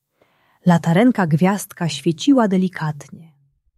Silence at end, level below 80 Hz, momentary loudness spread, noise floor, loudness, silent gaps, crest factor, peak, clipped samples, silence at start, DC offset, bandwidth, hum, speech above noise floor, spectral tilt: 0.6 s; -62 dBFS; 10 LU; -61 dBFS; -18 LUFS; none; 16 dB; -2 dBFS; under 0.1%; 0.65 s; under 0.1%; 13 kHz; none; 44 dB; -6.5 dB/octave